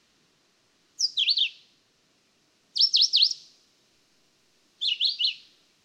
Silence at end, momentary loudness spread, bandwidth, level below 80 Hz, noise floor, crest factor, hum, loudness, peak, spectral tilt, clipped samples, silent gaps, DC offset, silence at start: 0.45 s; 13 LU; 16 kHz; -90 dBFS; -67 dBFS; 20 dB; none; -22 LUFS; -8 dBFS; 5 dB/octave; under 0.1%; none; under 0.1%; 1 s